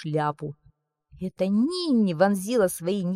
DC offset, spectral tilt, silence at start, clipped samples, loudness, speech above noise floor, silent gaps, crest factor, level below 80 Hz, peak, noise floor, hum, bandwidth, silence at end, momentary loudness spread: under 0.1%; -6 dB/octave; 0 s; under 0.1%; -24 LUFS; 38 dB; none; 16 dB; -62 dBFS; -8 dBFS; -62 dBFS; none; 15.5 kHz; 0 s; 14 LU